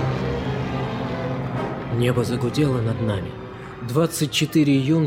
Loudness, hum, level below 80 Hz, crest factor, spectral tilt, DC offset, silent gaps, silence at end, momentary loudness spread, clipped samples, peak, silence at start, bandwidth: -23 LUFS; none; -42 dBFS; 16 dB; -6 dB/octave; under 0.1%; none; 0 s; 9 LU; under 0.1%; -6 dBFS; 0 s; 16.5 kHz